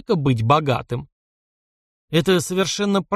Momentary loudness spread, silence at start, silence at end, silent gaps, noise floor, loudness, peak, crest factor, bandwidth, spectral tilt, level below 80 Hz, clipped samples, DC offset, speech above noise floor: 7 LU; 0.1 s; 0 s; 1.12-2.08 s; under -90 dBFS; -20 LUFS; -4 dBFS; 18 dB; 15.5 kHz; -5.5 dB/octave; -50 dBFS; under 0.1%; under 0.1%; over 71 dB